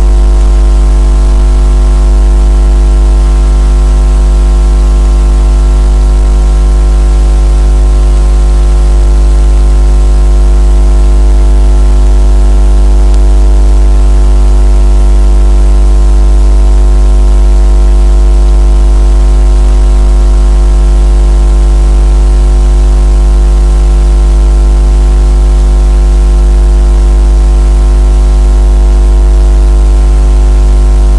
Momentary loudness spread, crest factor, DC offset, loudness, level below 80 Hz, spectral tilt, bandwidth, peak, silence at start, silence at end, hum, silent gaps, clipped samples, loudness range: 1 LU; 4 dB; under 0.1%; -8 LUFS; -4 dBFS; -7 dB/octave; 10.5 kHz; 0 dBFS; 0 s; 0 s; 50 Hz at -5 dBFS; none; under 0.1%; 1 LU